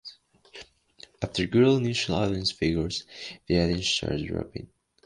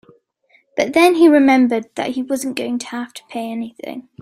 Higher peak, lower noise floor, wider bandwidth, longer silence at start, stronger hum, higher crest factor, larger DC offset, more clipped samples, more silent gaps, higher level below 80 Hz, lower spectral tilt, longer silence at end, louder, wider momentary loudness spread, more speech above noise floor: second, -10 dBFS vs 0 dBFS; second, -54 dBFS vs -58 dBFS; second, 11 kHz vs 15.5 kHz; second, 0.05 s vs 0.75 s; neither; about the same, 18 dB vs 16 dB; neither; neither; neither; first, -46 dBFS vs -62 dBFS; about the same, -5 dB/octave vs -4 dB/octave; first, 0.4 s vs 0.2 s; second, -26 LUFS vs -16 LUFS; about the same, 20 LU vs 18 LU; second, 28 dB vs 42 dB